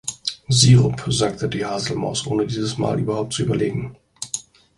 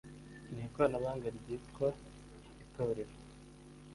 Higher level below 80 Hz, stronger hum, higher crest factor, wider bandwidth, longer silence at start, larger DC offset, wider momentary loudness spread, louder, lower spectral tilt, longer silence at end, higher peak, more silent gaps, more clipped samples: first, -46 dBFS vs -60 dBFS; neither; about the same, 20 dB vs 22 dB; about the same, 11.5 kHz vs 11.5 kHz; about the same, 0.05 s vs 0.05 s; neither; second, 15 LU vs 22 LU; first, -20 LUFS vs -38 LUFS; second, -5 dB/octave vs -7 dB/octave; first, 0.35 s vs 0 s; first, 0 dBFS vs -18 dBFS; neither; neither